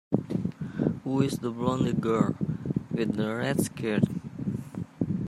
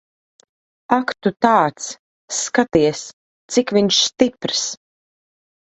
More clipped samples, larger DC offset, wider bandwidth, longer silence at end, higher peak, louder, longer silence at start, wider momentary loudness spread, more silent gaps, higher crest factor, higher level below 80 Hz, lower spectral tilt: neither; neither; first, 14.5 kHz vs 8.4 kHz; second, 0 s vs 0.9 s; second, -8 dBFS vs 0 dBFS; second, -29 LUFS vs -18 LUFS; second, 0.1 s vs 0.9 s; second, 8 LU vs 15 LU; second, none vs 1.99-2.28 s, 3.13-3.49 s; about the same, 20 dB vs 20 dB; about the same, -56 dBFS vs -54 dBFS; first, -7 dB/octave vs -3 dB/octave